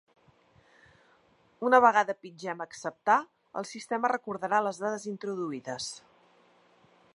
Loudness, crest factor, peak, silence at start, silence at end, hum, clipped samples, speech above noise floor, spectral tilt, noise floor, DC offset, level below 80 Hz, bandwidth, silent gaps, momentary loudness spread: -29 LUFS; 24 dB; -6 dBFS; 1.6 s; 1.15 s; none; under 0.1%; 36 dB; -4 dB/octave; -65 dBFS; under 0.1%; -78 dBFS; 11.5 kHz; none; 16 LU